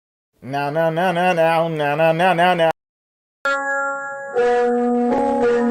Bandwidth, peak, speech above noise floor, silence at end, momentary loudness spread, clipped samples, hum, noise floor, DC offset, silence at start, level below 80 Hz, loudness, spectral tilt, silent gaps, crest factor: 16 kHz; -4 dBFS; over 73 dB; 0 s; 9 LU; under 0.1%; none; under -90 dBFS; under 0.1%; 0.4 s; -56 dBFS; -18 LUFS; -6 dB/octave; 2.89-3.45 s; 14 dB